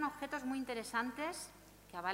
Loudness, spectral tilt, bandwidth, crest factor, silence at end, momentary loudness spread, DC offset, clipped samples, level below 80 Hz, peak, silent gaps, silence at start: -41 LUFS; -3 dB/octave; 16 kHz; 20 dB; 0 s; 12 LU; under 0.1%; under 0.1%; -68 dBFS; -22 dBFS; none; 0 s